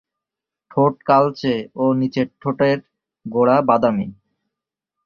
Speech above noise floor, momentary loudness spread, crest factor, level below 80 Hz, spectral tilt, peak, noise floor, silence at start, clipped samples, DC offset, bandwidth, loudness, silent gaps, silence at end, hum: 68 dB; 10 LU; 18 dB; -58 dBFS; -8.5 dB/octave; -2 dBFS; -86 dBFS; 0.75 s; under 0.1%; under 0.1%; 6.8 kHz; -19 LUFS; none; 0.95 s; none